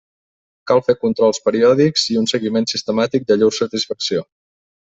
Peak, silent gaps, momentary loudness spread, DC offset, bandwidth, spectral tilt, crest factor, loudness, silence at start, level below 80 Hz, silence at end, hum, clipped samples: -2 dBFS; none; 7 LU; under 0.1%; 8.4 kHz; -4.5 dB/octave; 16 dB; -17 LUFS; 0.65 s; -58 dBFS; 0.7 s; none; under 0.1%